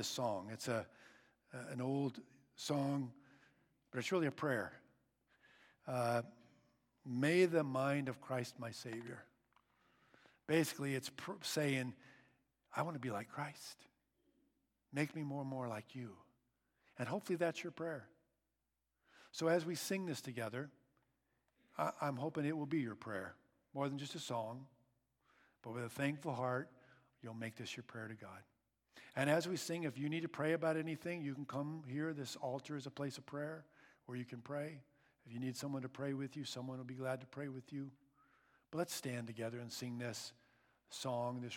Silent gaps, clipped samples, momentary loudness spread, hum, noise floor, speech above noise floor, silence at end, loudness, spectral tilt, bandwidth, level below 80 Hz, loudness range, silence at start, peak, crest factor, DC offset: none; under 0.1%; 16 LU; none; -89 dBFS; 47 dB; 0 s; -42 LUFS; -5 dB/octave; 17.5 kHz; -88 dBFS; 7 LU; 0 s; -20 dBFS; 24 dB; under 0.1%